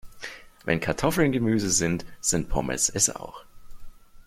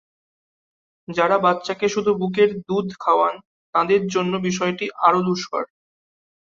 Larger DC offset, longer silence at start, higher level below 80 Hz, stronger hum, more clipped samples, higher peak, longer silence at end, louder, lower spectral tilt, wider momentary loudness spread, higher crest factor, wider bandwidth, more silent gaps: neither; second, 0.05 s vs 1.1 s; first, -42 dBFS vs -64 dBFS; neither; neither; second, -8 dBFS vs -2 dBFS; second, 0.05 s vs 0.85 s; second, -24 LUFS vs -21 LUFS; second, -3.5 dB/octave vs -5.5 dB/octave; first, 17 LU vs 8 LU; about the same, 20 dB vs 20 dB; first, 16 kHz vs 7.6 kHz; second, none vs 3.45-3.73 s